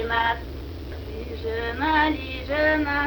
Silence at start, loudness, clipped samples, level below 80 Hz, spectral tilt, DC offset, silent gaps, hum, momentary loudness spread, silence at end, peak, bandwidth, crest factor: 0 s; -24 LUFS; under 0.1%; -36 dBFS; -6.5 dB/octave; under 0.1%; none; none; 15 LU; 0 s; -8 dBFS; over 20 kHz; 18 dB